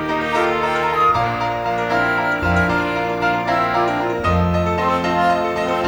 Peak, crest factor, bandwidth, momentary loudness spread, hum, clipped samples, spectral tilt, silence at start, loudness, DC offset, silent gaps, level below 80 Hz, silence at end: -4 dBFS; 14 dB; over 20 kHz; 3 LU; none; under 0.1%; -6 dB/octave; 0 s; -18 LUFS; under 0.1%; none; -38 dBFS; 0 s